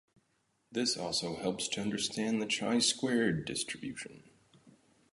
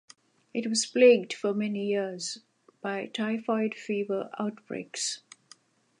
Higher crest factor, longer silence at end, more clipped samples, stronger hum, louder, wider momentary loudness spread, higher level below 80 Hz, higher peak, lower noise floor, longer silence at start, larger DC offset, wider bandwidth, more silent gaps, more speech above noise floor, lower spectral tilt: about the same, 20 dB vs 20 dB; second, 0.4 s vs 0.85 s; neither; neither; second, -33 LUFS vs -28 LUFS; second, 12 LU vs 16 LU; first, -68 dBFS vs -84 dBFS; second, -16 dBFS vs -8 dBFS; first, -76 dBFS vs -59 dBFS; first, 0.7 s vs 0.55 s; neither; about the same, 11.5 kHz vs 11.5 kHz; neither; first, 42 dB vs 31 dB; about the same, -3 dB/octave vs -3.5 dB/octave